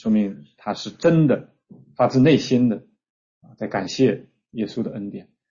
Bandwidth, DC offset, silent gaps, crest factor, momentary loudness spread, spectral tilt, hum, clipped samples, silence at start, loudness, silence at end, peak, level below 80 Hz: 7.4 kHz; under 0.1%; 3.10-3.41 s; 16 dB; 17 LU; -7 dB/octave; none; under 0.1%; 0.05 s; -21 LUFS; 0.3 s; -4 dBFS; -58 dBFS